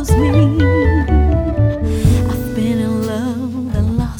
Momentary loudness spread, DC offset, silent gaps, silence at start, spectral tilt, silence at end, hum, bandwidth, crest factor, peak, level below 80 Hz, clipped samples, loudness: 7 LU; under 0.1%; none; 0 s; -7.5 dB/octave; 0 s; none; 18 kHz; 14 dB; 0 dBFS; -20 dBFS; under 0.1%; -15 LUFS